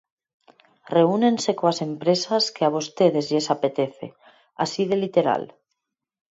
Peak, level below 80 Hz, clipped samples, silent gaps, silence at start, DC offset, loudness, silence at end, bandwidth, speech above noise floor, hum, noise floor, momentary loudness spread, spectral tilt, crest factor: -4 dBFS; -72 dBFS; under 0.1%; none; 0.9 s; under 0.1%; -22 LUFS; 0.85 s; 8 kHz; 59 dB; none; -80 dBFS; 8 LU; -5 dB/octave; 18 dB